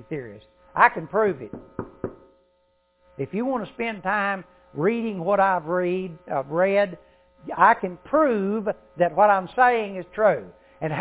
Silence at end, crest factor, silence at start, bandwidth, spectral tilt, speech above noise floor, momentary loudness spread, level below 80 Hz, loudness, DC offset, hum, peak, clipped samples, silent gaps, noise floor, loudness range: 0 s; 22 dB; 0.1 s; 4 kHz; -10 dB/octave; 43 dB; 16 LU; -60 dBFS; -23 LUFS; under 0.1%; none; -2 dBFS; under 0.1%; none; -66 dBFS; 8 LU